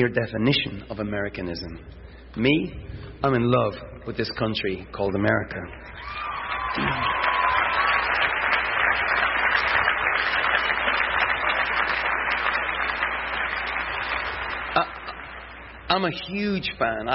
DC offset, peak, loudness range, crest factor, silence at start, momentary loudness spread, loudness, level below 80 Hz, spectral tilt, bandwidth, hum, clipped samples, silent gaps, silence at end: under 0.1%; -6 dBFS; 6 LU; 18 dB; 0 s; 14 LU; -23 LUFS; -44 dBFS; -8.5 dB/octave; 6 kHz; none; under 0.1%; none; 0 s